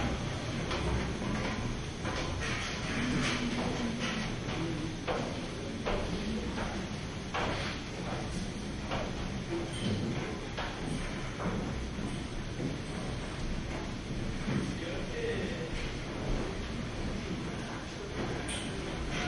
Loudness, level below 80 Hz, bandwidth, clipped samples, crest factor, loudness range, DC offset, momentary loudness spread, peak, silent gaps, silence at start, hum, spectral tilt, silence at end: -36 LUFS; -42 dBFS; 11.5 kHz; under 0.1%; 16 dB; 3 LU; under 0.1%; 5 LU; -20 dBFS; none; 0 s; none; -5 dB/octave; 0 s